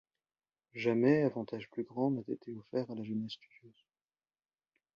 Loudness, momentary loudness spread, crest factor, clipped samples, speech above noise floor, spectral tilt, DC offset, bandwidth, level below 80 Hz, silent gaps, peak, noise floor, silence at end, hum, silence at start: -35 LUFS; 15 LU; 22 dB; under 0.1%; over 55 dB; -8.5 dB/octave; under 0.1%; 7 kHz; -78 dBFS; none; -16 dBFS; under -90 dBFS; 1.25 s; none; 0.75 s